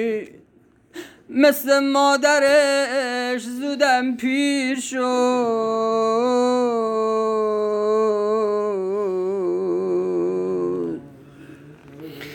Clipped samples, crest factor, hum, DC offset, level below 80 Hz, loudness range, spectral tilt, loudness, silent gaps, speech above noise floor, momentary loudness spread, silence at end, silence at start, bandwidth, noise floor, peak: under 0.1%; 16 dB; none; under 0.1%; -66 dBFS; 5 LU; -3.5 dB/octave; -20 LUFS; none; 27 dB; 11 LU; 0 s; 0 s; 19 kHz; -46 dBFS; -4 dBFS